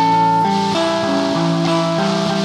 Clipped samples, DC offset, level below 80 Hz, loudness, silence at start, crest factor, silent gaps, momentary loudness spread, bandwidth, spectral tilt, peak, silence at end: under 0.1%; under 0.1%; -58 dBFS; -16 LUFS; 0 s; 12 dB; none; 3 LU; 12 kHz; -5.5 dB/octave; -4 dBFS; 0 s